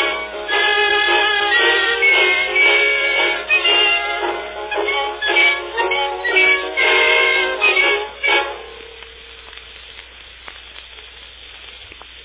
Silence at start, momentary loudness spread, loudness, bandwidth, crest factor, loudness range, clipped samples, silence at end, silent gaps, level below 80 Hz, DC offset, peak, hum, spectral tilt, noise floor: 0 s; 23 LU; -14 LUFS; 4 kHz; 16 dB; 8 LU; under 0.1%; 0 s; none; -50 dBFS; under 0.1%; -2 dBFS; none; -4.5 dB/octave; -39 dBFS